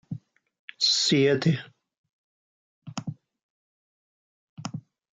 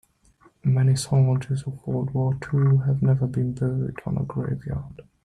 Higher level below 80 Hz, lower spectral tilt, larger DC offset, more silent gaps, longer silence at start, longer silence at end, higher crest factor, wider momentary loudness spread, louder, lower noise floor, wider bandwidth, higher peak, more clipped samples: second, -74 dBFS vs -50 dBFS; second, -4 dB/octave vs -7.5 dB/octave; neither; first, 0.59-0.68 s, 1.98-2.04 s, 2.13-2.82 s, 3.43-4.57 s vs none; second, 0.1 s vs 0.65 s; about the same, 0.35 s vs 0.25 s; first, 20 dB vs 12 dB; first, 20 LU vs 9 LU; about the same, -23 LUFS vs -24 LUFS; first, under -90 dBFS vs -58 dBFS; second, 9.4 kHz vs 11.5 kHz; about the same, -10 dBFS vs -10 dBFS; neither